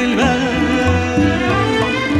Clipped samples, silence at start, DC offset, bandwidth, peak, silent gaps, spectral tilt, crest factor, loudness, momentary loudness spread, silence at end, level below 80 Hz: under 0.1%; 0 s; under 0.1%; 12.5 kHz; -2 dBFS; none; -5.5 dB/octave; 12 dB; -15 LUFS; 1 LU; 0 s; -32 dBFS